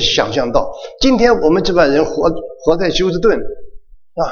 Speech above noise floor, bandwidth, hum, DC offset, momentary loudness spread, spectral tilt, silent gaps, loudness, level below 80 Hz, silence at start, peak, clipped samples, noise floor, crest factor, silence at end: 21 dB; 7.2 kHz; none; under 0.1%; 12 LU; -4.5 dB/octave; none; -14 LUFS; -30 dBFS; 0 s; 0 dBFS; under 0.1%; -34 dBFS; 14 dB; 0 s